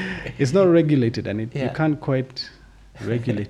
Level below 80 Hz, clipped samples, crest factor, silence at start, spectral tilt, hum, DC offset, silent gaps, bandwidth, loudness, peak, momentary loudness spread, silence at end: -50 dBFS; under 0.1%; 16 dB; 0 s; -7.5 dB/octave; none; under 0.1%; none; 11 kHz; -21 LUFS; -6 dBFS; 15 LU; 0 s